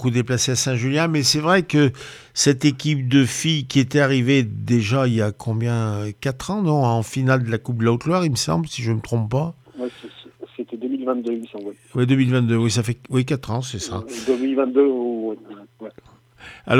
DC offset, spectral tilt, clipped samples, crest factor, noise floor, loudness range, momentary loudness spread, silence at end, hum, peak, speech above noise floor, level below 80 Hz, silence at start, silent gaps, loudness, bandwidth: under 0.1%; -5 dB/octave; under 0.1%; 18 dB; -48 dBFS; 6 LU; 14 LU; 0 s; none; -4 dBFS; 28 dB; -54 dBFS; 0 s; none; -20 LUFS; 15 kHz